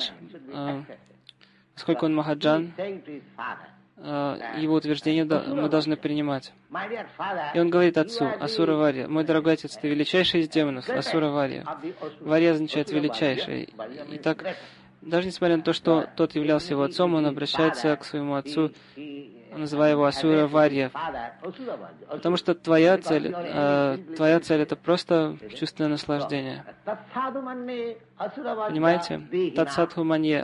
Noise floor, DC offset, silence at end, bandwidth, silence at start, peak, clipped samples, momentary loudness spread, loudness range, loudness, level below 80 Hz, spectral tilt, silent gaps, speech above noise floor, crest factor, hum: -55 dBFS; under 0.1%; 0 s; 11 kHz; 0 s; -6 dBFS; under 0.1%; 15 LU; 5 LU; -25 LUFS; -64 dBFS; -6.5 dB/octave; none; 30 dB; 18 dB; none